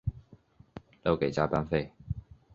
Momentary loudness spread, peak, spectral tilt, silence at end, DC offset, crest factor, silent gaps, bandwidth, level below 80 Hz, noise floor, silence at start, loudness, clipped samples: 22 LU; -10 dBFS; -7.5 dB/octave; 0.35 s; under 0.1%; 24 dB; none; 7.8 kHz; -48 dBFS; -58 dBFS; 0.05 s; -32 LUFS; under 0.1%